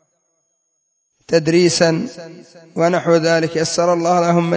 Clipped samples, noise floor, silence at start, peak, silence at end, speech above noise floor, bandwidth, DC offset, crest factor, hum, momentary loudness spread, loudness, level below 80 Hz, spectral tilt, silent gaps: under 0.1%; -68 dBFS; 1.3 s; 0 dBFS; 0 s; 52 dB; 8 kHz; under 0.1%; 16 dB; none; 15 LU; -16 LUFS; -60 dBFS; -5 dB/octave; none